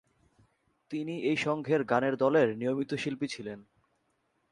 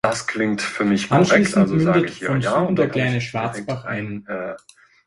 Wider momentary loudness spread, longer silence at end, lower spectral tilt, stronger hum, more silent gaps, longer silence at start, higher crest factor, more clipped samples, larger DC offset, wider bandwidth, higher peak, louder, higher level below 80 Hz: about the same, 14 LU vs 13 LU; first, 0.9 s vs 0.5 s; about the same, -6 dB/octave vs -6 dB/octave; neither; neither; first, 0.9 s vs 0.05 s; about the same, 20 dB vs 20 dB; neither; neither; about the same, 11.5 kHz vs 11.5 kHz; second, -12 dBFS vs 0 dBFS; second, -30 LUFS vs -20 LUFS; second, -72 dBFS vs -54 dBFS